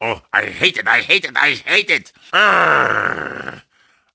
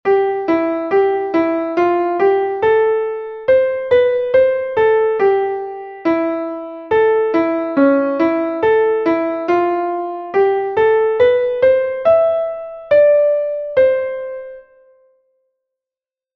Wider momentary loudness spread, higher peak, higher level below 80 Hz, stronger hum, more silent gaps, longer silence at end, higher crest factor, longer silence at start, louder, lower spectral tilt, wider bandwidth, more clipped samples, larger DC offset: about the same, 11 LU vs 9 LU; about the same, 0 dBFS vs -2 dBFS; about the same, -56 dBFS vs -54 dBFS; neither; neither; second, 0.55 s vs 1.75 s; about the same, 18 dB vs 14 dB; about the same, 0 s vs 0.05 s; about the same, -14 LUFS vs -15 LUFS; second, -3 dB/octave vs -7.5 dB/octave; first, 8 kHz vs 6 kHz; neither; neither